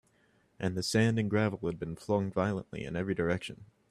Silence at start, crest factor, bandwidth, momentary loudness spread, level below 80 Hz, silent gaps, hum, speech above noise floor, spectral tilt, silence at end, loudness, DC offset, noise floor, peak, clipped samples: 0.6 s; 18 dB; 14 kHz; 10 LU; -60 dBFS; none; none; 37 dB; -6 dB/octave; 0.25 s; -32 LUFS; under 0.1%; -69 dBFS; -14 dBFS; under 0.1%